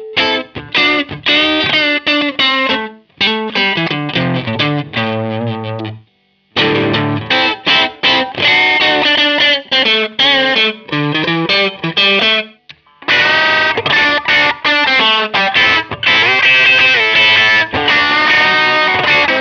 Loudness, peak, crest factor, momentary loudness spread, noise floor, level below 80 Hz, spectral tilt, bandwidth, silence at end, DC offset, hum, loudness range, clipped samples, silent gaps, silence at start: -10 LUFS; 0 dBFS; 12 dB; 9 LU; -56 dBFS; -50 dBFS; -4 dB/octave; 7 kHz; 0 s; under 0.1%; none; 8 LU; under 0.1%; none; 0 s